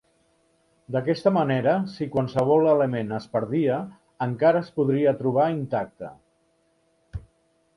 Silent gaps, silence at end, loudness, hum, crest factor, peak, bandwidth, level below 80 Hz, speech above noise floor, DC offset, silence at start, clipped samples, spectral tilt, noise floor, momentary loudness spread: none; 0.55 s; -23 LUFS; none; 18 dB; -6 dBFS; 11 kHz; -54 dBFS; 44 dB; under 0.1%; 0.9 s; under 0.1%; -8.5 dB/octave; -67 dBFS; 20 LU